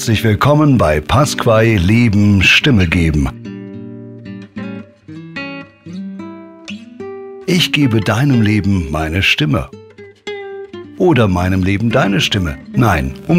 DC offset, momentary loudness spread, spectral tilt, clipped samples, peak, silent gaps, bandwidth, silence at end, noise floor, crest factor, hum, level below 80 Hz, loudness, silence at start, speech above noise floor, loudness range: under 0.1%; 20 LU; -5.5 dB/octave; under 0.1%; 0 dBFS; none; 16 kHz; 0 s; -33 dBFS; 14 dB; none; -34 dBFS; -13 LUFS; 0 s; 21 dB; 17 LU